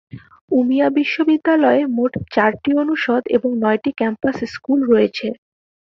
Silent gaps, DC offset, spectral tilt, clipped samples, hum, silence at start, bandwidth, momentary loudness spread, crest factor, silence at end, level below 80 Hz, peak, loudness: 0.41-0.48 s; under 0.1%; -7 dB/octave; under 0.1%; none; 0.15 s; 6.8 kHz; 7 LU; 16 dB; 0.5 s; -54 dBFS; -2 dBFS; -17 LUFS